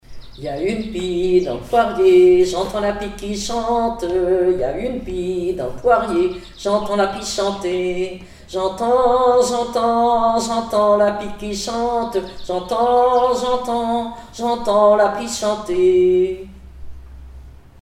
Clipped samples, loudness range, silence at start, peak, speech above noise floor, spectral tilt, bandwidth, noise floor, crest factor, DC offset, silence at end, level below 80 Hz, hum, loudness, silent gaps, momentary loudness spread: under 0.1%; 3 LU; 0.1 s; -2 dBFS; 22 dB; -5 dB/octave; 13.5 kHz; -39 dBFS; 16 dB; under 0.1%; 0.25 s; -40 dBFS; none; -18 LUFS; none; 11 LU